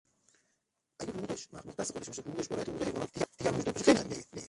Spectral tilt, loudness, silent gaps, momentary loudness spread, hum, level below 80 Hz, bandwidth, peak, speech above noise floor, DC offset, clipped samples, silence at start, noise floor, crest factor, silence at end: -4.5 dB/octave; -34 LUFS; none; 15 LU; none; -62 dBFS; 11.5 kHz; -10 dBFS; 43 dB; under 0.1%; under 0.1%; 1 s; -81 dBFS; 26 dB; 0 s